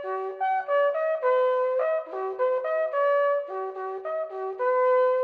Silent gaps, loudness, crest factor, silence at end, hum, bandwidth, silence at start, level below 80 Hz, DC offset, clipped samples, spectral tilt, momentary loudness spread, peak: none; -26 LUFS; 12 dB; 0 s; none; 4.8 kHz; 0 s; -86 dBFS; under 0.1%; under 0.1%; -4 dB/octave; 10 LU; -12 dBFS